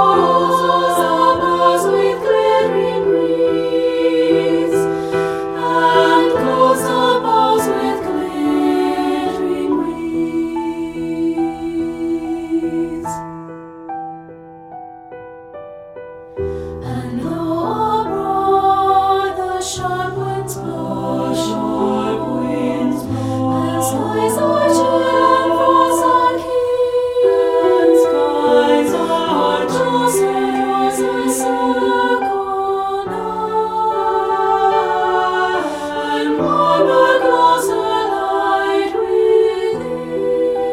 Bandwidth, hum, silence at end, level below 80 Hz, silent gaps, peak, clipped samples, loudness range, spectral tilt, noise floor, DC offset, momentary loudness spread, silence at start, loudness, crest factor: 16 kHz; none; 0 s; -48 dBFS; none; 0 dBFS; under 0.1%; 9 LU; -5 dB/octave; -36 dBFS; under 0.1%; 11 LU; 0 s; -16 LUFS; 16 dB